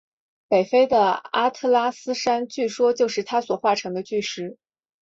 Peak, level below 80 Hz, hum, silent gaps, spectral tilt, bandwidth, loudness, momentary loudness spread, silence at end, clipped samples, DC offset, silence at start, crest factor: -6 dBFS; -66 dBFS; none; none; -4 dB/octave; 7.8 kHz; -22 LUFS; 9 LU; 0.5 s; under 0.1%; under 0.1%; 0.5 s; 16 dB